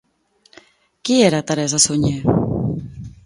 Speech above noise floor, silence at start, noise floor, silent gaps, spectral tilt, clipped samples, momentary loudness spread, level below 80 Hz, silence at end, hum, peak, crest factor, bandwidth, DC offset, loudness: 43 dB; 1.05 s; -59 dBFS; none; -4.5 dB/octave; under 0.1%; 14 LU; -42 dBFS; 0.15 s; none; 0 dBFS; 20 dB; 11.5 kHz; under 0.1%; -17 LUFS